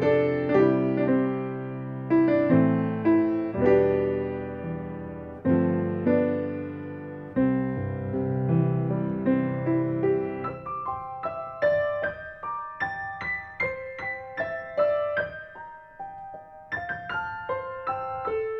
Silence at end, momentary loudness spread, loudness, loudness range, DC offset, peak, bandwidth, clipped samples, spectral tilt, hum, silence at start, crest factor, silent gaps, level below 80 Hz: 0 s; 14 LU; -26 LUFS; 7 LU; under 0.1%; -8 dBFS; 5.8 kHz; under 0.1%; -10 dB/octave; none; 0 s; 18 dB; none; -58 dBFS